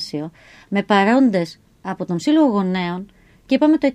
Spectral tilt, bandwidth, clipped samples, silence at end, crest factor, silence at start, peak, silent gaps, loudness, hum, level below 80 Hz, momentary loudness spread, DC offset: -6.5 dB/octave; 10.5 kHz; under 0.1%; 0 s; 16 dB; 0 s; -4 dBFS; none; -18 LUFS; none; -58 dBFS; 15 LU; under 0.1%